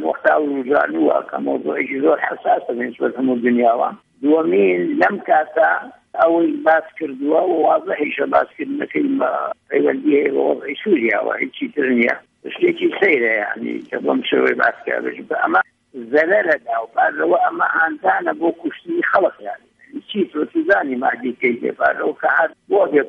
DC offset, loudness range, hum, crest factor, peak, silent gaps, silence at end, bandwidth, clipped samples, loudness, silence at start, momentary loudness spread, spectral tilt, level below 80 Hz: under 0.1%; 2 LU; none; 16 dB; -2 dBFS; none; 0 s; 5.8 kHz; under 0.1%; -18 LUFS; 0 s; 8 LU; -7 dB/octave; -66 dBFS